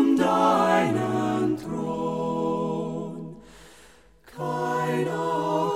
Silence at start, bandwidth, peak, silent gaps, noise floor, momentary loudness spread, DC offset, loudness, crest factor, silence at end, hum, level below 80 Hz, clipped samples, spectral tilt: 0 s; 16 kHz; -8 dBFS; none; -54 dBFS; 13 LU; 0.1%; -25 LUFS; 18 dB; 0 s; none; -60 dBFS; under 0.1%; -6.5 dB/octave